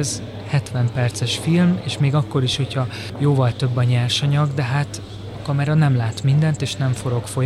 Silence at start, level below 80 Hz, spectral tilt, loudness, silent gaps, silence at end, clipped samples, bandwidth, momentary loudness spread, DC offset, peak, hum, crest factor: 0 s; -48 dBFS; -6 dB/octave; -20 LUFS; none; 0 s; under 0.1%; 12.5 kHz; 7 LU; under 0.1%; -6 dBFS; none; 14 dB